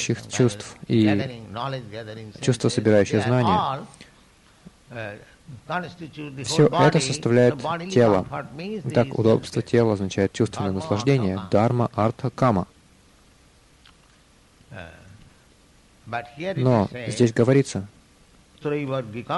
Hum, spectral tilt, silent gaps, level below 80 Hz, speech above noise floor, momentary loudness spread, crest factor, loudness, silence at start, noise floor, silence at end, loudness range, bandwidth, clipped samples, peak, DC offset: none; -6 dB/octave; none; -56 dBFS; 34 dB; 17 LU; 20 dB; -22 LUFS; 0 s; -56 dBFS; 0 s; 8 LU; 11.5 kHz; under 0.1%; -4 dBFS; under 0.1%